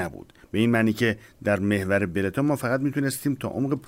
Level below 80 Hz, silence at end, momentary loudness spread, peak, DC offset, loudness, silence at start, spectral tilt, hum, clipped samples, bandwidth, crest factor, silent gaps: -58 dBFS; 0 s; 6 LU; -10 dBFS; under 0.1%; -25 LUFS; 0 s; -6 dB/octave; none; under 0.1%; 16 kHz; 16 dB; none